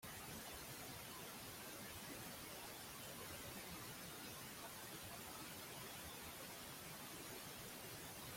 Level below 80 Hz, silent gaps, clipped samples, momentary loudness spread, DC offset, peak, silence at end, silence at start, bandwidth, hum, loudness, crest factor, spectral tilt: -72 dBFS; none; under 0.1%; 1 LU; under 0.1%; -40 dBFS; 0 s; 0 s; 16.5 kHz; none; -52 LUFS; 14 dB; -2.5 dB/octave